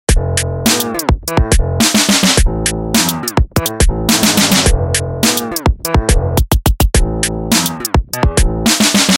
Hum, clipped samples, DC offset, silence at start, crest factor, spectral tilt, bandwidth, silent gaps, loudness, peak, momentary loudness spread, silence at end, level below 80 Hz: none; under 0.1%; under 0.1%; 0.1 s; 12 dB; -3.5 dB/octave; 17.5 kHz; none; -13 LUFS; 0 dBFS; 7 LU; 0 s; -18 dBFS